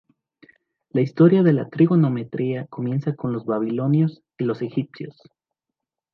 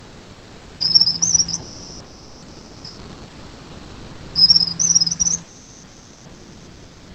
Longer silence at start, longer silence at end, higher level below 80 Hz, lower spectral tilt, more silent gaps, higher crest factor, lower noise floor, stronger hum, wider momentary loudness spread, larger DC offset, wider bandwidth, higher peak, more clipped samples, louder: first, 0.95 s vs 0.05 s; first, 1.05 s vs 0 s; second, -68 dBFS vs -48 dBFS; first, -11 dB/octave vs -0.5 dB/octave; neither; about the same, 18 dB vs 22 dB; first, -85 dBFS vs -43 dBFS; neither; second, 12 LU vs 27 LU; neither; second, 5.8 kHz vs 9 kHz; second, -4 dBFS vs 0 dBFS; neither; second, -21 LUFS vs -14 LUFS